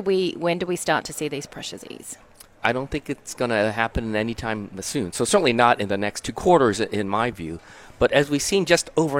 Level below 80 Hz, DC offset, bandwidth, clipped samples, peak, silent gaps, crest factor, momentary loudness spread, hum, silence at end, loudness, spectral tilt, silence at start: -46 dBFS; under 0.1%; 17 kHz; under 0.1%; -4 dBFS; none; 20 dB; 16 LU; none; 0 s; -22 LUFS; -4 dB/octave; 0 s